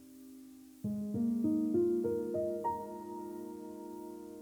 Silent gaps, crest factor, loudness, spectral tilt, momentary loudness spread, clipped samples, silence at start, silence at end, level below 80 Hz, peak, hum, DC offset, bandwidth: none; 14 dB; -36 LUFS; -8.5 dB/octave; 21 LU; under 0.1%; 0 s; 0 s; -70 dBFS; -22 dBFS; none; under 0.1%; over 20 kHz